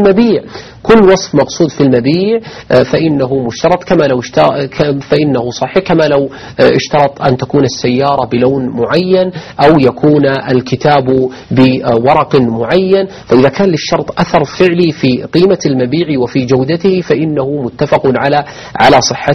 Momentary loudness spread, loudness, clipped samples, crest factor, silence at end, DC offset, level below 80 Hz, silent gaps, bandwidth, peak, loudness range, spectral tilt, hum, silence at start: 6 LU; -10 LUFS; 0.6%; 10 dB; 0 s; under 0.1%; -40 dBFS; none; 7.6 kHz; 0 dBFS; 2 LU; -6 dB/octave; none; 0 s